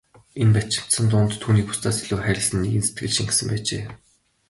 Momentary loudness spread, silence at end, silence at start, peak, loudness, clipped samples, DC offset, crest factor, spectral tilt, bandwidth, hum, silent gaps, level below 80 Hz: 7 LU; 0.55 s; 0.35 s; -6 dBFS; -22 LUFS; under 0.1%; under 0.1%; 16 dB; -4.5 dB/octave; 11.5 kHz; none; none; -44 dBFS